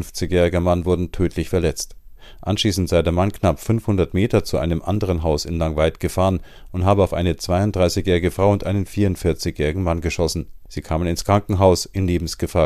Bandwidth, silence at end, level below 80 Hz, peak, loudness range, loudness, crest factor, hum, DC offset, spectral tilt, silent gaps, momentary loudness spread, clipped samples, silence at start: 14.5 kHz; 0 s; -36 dBFS; -2 dBFS; 2 LU; -20 LUFS; 18 dB; none; under 0.1%; -6 dB/octave; none; 6 LU; under 0.1%; 0 s